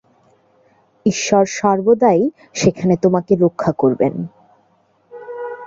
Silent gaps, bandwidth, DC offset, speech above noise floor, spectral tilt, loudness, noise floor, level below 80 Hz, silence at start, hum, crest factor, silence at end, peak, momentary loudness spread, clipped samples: none; 7.8 kHz; under 0.1%; 43 dB; -6 dB/octave; -16 LUFS; -58 dBFS; -54 dBFS; 1.05 s; none; 16 dB; 0 s; -2 dBFS; 16 LU; under 0.1%